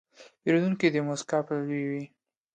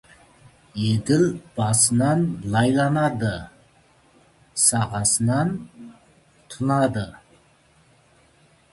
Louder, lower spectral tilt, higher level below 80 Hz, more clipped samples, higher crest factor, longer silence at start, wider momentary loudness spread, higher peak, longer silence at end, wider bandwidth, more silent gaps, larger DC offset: second, -28 LUFS vs -21 LUFS; first, -6 dB/octave vs -4.5 dB/octave; second, -72 dBFS vs -52 dBFS; neither; about the same, 20 dB vs 20 dB; second, 0.2 s vs 0.75 s; second, 9 LU vs 16 LU; second, -10 dBFS vs -4 dBFS; second, 0.5 s vs 1.6 s; second, 9.4 kHz vs 12 kHz; neither; neither